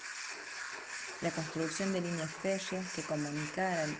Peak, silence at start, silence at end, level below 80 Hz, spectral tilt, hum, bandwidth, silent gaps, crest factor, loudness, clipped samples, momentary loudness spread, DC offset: -20 dBFS; 0 s; 0 s; -72 dBFS; -4 dB/octave; none; 10 kHz; none; 16 dB; -37 LUFS; under 0.1%; 7 LU; under 0.1%